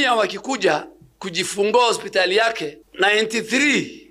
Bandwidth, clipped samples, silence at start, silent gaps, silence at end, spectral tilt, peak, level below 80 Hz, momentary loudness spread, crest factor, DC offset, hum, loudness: 15.5 kHz; under 0.1%; 0 s; none; 0.1 s; -2.5 dB/octave; -4 dBFS; -62 dBFS; 9 LU; 16 dB; under 0.1%; none; -19 LUFS